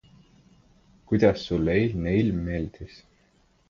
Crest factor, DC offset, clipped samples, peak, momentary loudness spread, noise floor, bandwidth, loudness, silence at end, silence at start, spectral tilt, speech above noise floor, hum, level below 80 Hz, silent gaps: 22 dB; under 0.1%; under 0.1%; -6 dBFS; 15 LU; -63 dBFS; 7.2 kHz; -25 LUFS; 0.85 s; 1.1 s; -8 dB/octave; 39 dB; none; -44 dBFS; none